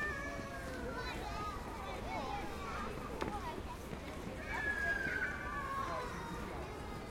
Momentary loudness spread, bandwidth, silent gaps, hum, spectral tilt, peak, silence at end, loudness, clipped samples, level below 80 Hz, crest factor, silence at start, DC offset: 9 LU; 16.5 kHz; none; none; -5 dB/octave; -22 dBFS; 0 s; -41 LUFS; under 0.1%; -50 dBFS; 18 dB; 0 s; under 0.1%